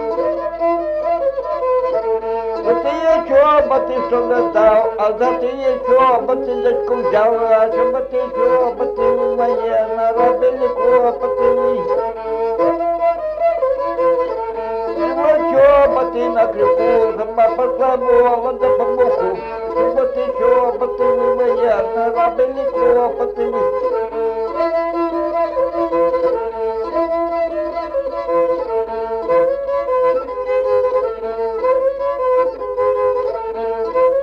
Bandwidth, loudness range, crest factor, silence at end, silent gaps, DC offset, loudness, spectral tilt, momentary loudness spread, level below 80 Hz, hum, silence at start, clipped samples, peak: 6.2 kHz; 4 LU; 14 dB; 0 s; none; under 0.1%; -16 LUFS; -6.5 dB/octave; 7 LU; -46 dBFS; none; 0 s; under 0.1%; -2 dBFS